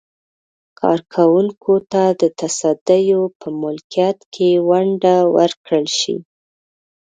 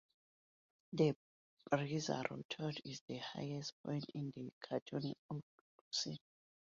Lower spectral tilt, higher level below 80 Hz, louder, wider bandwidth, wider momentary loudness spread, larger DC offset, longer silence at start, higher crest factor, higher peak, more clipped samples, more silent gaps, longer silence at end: about the same, -5 dB/octave vs -5 dB/octave; first, -66 dBFS vs -80 dBFS; first, -16 LUFS vs -43 LUFS; first, 9.4 kHz vs 7.4 kHz; second, 8 LU vs 12 LU; neither; about the same, 0.8 s vs 0.9 s; second, 16 dB vs 24 dB; first, 0 dBFS vs -20 dBFS; neither; second, 2.81-2.86 s, 3.35-3.40 s, 3.84-3.90 s, 4.26-4.32 s, 5.57-5.64 s vs 1.16-1.57 s, 2.45-2.49 s, 3.01-3.08 s, 3.72-3.84 s, 4.53-4.61 s, 4.82-4.86 s, 5.19-5.29 s, 5.43-5.91 s; first, 0.9 s vs 0.5 s